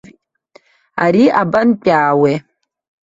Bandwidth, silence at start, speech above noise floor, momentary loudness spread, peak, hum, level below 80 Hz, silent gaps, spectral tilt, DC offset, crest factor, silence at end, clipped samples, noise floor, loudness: 7.8 kHz; 0.95 s; 38 dB; 8 LU; 0 dBFS; none; -56 dBFS; none; -7.5 dB/octave; under 0.1%; 16 dB; 0.65 s; under 0.1%; -50 dBFS; -13 LUFS